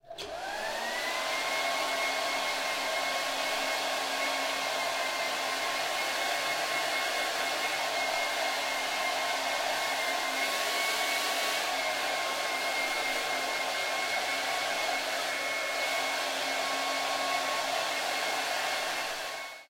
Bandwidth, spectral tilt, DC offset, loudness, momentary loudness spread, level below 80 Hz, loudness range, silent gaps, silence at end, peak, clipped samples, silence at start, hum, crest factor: 16.5 kHz; 0.5 dB/octave; under 0.1%; -30 LUFS; 2 LU; -70 dBFS; 1 LU; none; 0.05 s; -16 dBFS; under 0.1%; 0.05 s; none; 14 dB